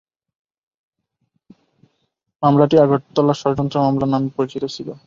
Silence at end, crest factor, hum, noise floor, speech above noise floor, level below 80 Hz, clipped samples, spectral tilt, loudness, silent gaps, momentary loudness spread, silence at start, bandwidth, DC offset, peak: 0.1 s; 18 dB; none; -70 dBFS; 54 dB; -54 dBFS; under 0.1%; -8 dB/octave; -17 LUFS; none; 10 LU; 2.4 s; 7.4 kHz; under 0.1%; -2 dBFS